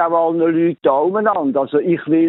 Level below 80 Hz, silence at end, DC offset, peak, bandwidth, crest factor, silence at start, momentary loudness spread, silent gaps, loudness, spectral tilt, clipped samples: -68 dBFS; 0 s; under 0.1%; -2 dBFS; 4 kHz; 12 dB; 0 s; 2 LU; none; -16 LUFS; -12 dB/octave; under 0.1%